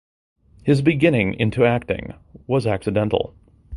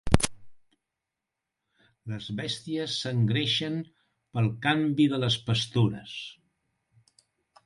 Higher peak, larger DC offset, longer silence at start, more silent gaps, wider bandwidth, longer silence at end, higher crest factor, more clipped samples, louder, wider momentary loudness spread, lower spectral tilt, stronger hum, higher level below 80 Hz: about the same, -2 dBFS vs 0 dBFS; neither; first, 0.65 s vs 0.05 s; neither; about the same, 11.5 kHz vs 11.5 kHz; second, 0 s vs 1.3 s; second, 18 dB vs 30 dB; neither; first, -20 LUFS vs -28 LUFS; second, 11 LU vs 14 LU; first, -7.5 dB/octave vs -5 dB/octave; neither; about the same, -44 dBFS vs -46 dBFS